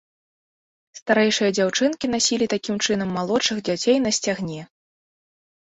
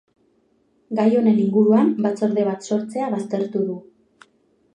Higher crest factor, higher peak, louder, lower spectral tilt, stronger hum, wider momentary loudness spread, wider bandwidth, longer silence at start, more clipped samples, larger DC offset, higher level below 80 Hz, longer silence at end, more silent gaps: about the same, 18 dB vs 16 dB; about the same, -4 dBFS vs -4 dBFS; about the same, -21 LUFS vs -20 LUFS; second, -3 dB/octave vs -8 dB/octave; neither; about the same, 7 LU vs 9 LU; second, 8.4 kHz vs 9.6 kHz; about the same, 0.95 s vs 0.9 s; neither; neither; first, -60 dBFS vs -74 dBFS; first, 1.1 s vs 0.95 s; first, 1.02-1.06 s vs none